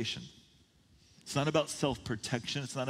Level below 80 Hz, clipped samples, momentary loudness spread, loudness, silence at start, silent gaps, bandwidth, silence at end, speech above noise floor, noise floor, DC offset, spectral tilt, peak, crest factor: -62 dBFS; under 0.1%; 14 LU; -34 LUFS; 0 s; none; 16 kHz; 0 s; 31 dB; -65 dBFS; under 0.1%; -4.5 dB/octave; -14 dBFS; 22 dB